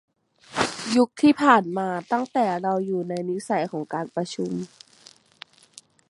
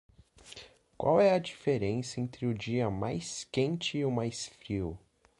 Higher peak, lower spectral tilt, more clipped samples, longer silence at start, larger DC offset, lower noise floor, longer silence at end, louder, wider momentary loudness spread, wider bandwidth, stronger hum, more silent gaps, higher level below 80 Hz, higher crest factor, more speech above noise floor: first, -2 dBFS vs -14 dBFS; about the same, -5 dB/octave vs -5.5 dB/octave; neither; about the same, 0.5 s vs 0.45 s; neither; about the same, -53 dBFS vs -53 dBFS; first, 1.45 s vs 0.4 s; first, -24 LUFS vs -32 LUFS; second, 12 LU vs 18 LU; about the same, 11.5 kHz vs 11.5 kHz; neither; neither; second, -66 dBFS vs -58 dBFS; about the same, 22 dB vs 20 dB; first, 30 dB vs 22 dB